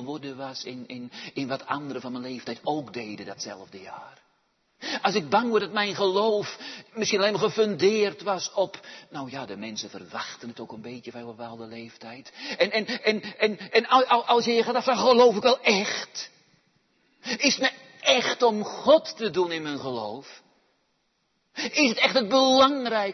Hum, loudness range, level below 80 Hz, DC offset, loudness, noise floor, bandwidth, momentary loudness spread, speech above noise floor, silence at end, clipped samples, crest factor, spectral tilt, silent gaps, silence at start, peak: none; 12 LU; -74 dBFS; under 0.1%; -24 LUFS; -72 dBFS; 6.4 kHz; 19 LU; 47 dB; 0 s; under 0.1%; 20 dB; -3 dB/octave; none; 0 s; -6 dBFS